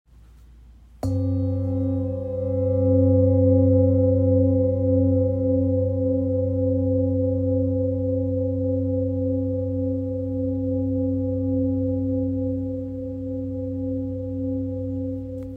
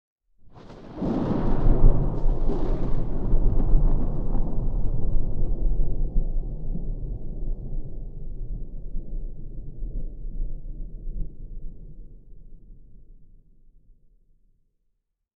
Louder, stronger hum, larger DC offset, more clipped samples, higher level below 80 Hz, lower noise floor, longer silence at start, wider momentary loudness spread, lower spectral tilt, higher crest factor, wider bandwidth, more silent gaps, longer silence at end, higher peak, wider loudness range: first, -23 LUFS vs -30 LUFS; neither; neither; neither; second, -46 dBFS vs -24 dBFS; second, -48 dBFS vs -73 dBFS; about the same, 0.4 s vs 0.45 s; second, 10 LU vs 16 LU; first, -12.5 dB/octave vs -11 dB/octave; about the same, 14 dB vs 18 dB; second, 1.4 kHz vs 1.9 kHz; neither; second, 0 s vs 2.1 s; second, -8 dBFS vs -4 dBFS; second, 7 LU vs 16 LU